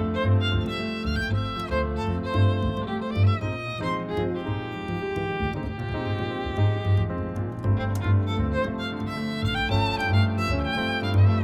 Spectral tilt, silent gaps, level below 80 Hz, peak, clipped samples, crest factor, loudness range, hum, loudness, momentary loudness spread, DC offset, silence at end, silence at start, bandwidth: -7.5 dB/octave; none; -38 dBFS; -10 dBFS; under 0.1%; 14 dB; 3 LU; none; -26 LUFS; 7 LU; under 0.1%; 0 s; 0 s; 8.8 kHz